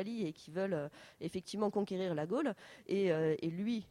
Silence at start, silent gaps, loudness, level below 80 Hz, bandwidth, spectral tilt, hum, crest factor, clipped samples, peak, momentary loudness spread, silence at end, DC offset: 0 s; none; -37 LUFS; -76 dBFS; 13.5 kHz; -7 dB/octave; none; 16 dB; under 0.1%; -22 dBFS; 10 LU; 0.05 s; under 0.1%